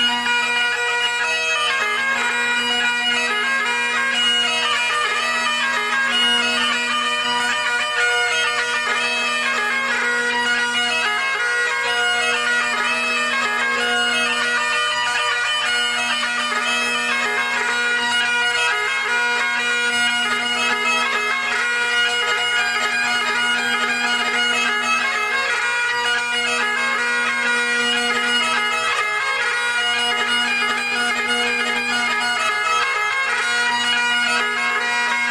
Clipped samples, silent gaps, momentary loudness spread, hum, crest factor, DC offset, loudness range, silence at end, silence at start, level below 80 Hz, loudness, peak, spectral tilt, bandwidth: under 0.1%; none; 2 LU; none; 14 dB; under 0.1%; 1 LU; 0 s; 0 s; -62 dBFS; -18 LUFS; -6 dBFS; 0.5 dB/octave; 16 kHz